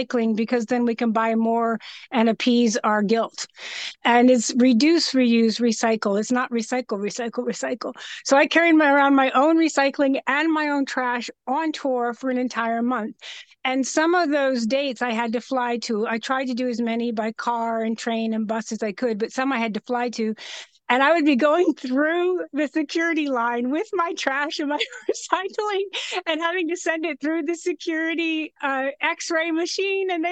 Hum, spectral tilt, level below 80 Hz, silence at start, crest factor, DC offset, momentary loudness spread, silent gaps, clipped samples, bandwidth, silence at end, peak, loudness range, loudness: none; -3.5 dB/octave; -74 dBFS; 0 s; 16 dB; under 0.1%; 10 LU; none; under 0.1%; 9 kHz; 0 s; -6 dBFS; 6 LU; -22 LUFS